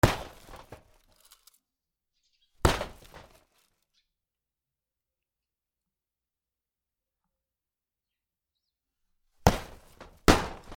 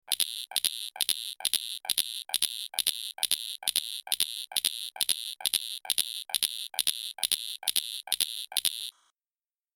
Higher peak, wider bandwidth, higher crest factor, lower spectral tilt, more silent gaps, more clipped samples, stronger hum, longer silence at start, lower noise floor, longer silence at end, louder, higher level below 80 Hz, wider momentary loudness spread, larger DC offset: about the same, 0 dBFS vs -2 dBFS; first, 19.5 kHz vs 17 kHz; about the same, 34 dB vs 30 dB; first, -5 dB/octave vs 3 dB/octave; neither; neither; neither; about the same, 0.05 s vs 0.1 s; about the same, under -90 dBFS vs under -90 dBFS; second, 0 s vs 0.85 s; about the same, -28 LUFS vs -29 LUFS; first, -42 dBFS vs -74 dBFS; first, 25 LU vs 2 LU; neither